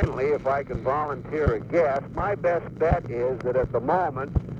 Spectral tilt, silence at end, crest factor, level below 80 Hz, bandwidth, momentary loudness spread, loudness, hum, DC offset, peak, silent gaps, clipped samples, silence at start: -9 dB/octave; 0 s; 18 dB; -36 dBFS; 7.6 kHz; 4 LU; -25 LUFS; none; under 0.1%; -6 dBFS; none; under 0.1%; 0 s